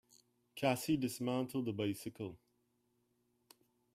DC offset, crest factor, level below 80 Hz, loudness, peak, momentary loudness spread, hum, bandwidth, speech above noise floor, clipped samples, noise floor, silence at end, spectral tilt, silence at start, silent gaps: under 0.1%; 22 dB; -76 dBFS; -39 LUFS; -20 dBFS; 13 LU; none; 15.5 kHz; 42 dB; under 0.1%; -79 dBFS; 1.6 s; -5.5 dB/octave; 0.55 s; none